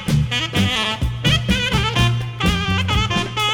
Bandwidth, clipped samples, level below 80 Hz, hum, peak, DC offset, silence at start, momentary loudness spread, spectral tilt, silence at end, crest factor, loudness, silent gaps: 17.5 kHz; under 0.1%; -30 dBFS; none; -4 dBFS; under 0.1%; 0 s; 3 LU; -4.5 dB/octave; 0 s; 14 dB; -18 LUFS; none